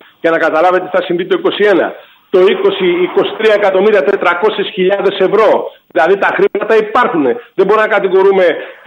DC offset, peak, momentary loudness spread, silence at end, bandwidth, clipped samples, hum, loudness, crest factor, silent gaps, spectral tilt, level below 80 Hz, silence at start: under 0.1%; 0 dBFS; 5 LU; 0.15 s; 7.2 kHz; under 0.1%; none; -11 LUFS; 10 dB; none; -6.5 dB/octave; -60 dBFS; 0.25 s